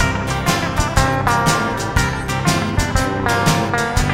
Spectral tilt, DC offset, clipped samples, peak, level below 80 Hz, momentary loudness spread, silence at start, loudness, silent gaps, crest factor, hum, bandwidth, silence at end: -4.5 dB/octave; under 0.1%; under 0.1%; 0 dBFS; -26 dBFS; 3 LU; 0 s; -17 LUFS; none; 16 dB; none; 16 kHz; 0 s